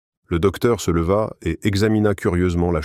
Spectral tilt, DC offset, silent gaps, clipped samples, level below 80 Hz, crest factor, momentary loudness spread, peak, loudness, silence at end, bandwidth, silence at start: -6.5 dB/octave; under 0.1%; none; under 0.1%; -36 dBFS; 16 dB; 5 LU; -4 dBFS; -20 LUFS; 0 s; 15.5 kHz; 0.3 s